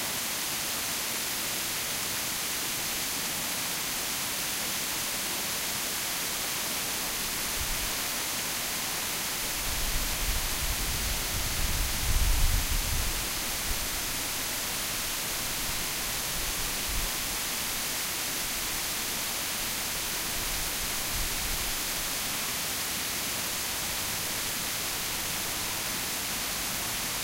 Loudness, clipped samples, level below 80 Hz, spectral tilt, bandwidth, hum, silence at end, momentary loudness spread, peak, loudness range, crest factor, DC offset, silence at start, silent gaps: -29 LUFS; under 0.1%; -38 dBFS; -1 dB/octave; 16 kHz; none; 0 s; 1 LU; -14 dBFS; 1 LU; 18 dB; under 0.1%; 0 s; none